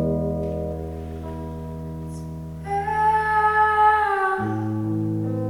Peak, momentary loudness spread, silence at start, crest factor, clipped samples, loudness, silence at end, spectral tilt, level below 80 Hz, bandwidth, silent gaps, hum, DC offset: -6 dBFS; 16 LU; 0 s; 16 dB; under 0.1%; -22 LUFS; 0 s; -7.5 dB/octave; -40 dBFS; 13 kHz; none; none; under 0.1%